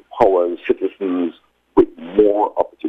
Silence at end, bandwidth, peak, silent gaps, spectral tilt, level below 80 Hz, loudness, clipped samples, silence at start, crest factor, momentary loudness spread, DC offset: 0 s; 5.4 kHz; 0 dBFS; none; -8 dB/octave; -48 dBFS; -18 LUFS; under 0.1%; 0.1 s; 18 dB; 6 LU; under 0.1%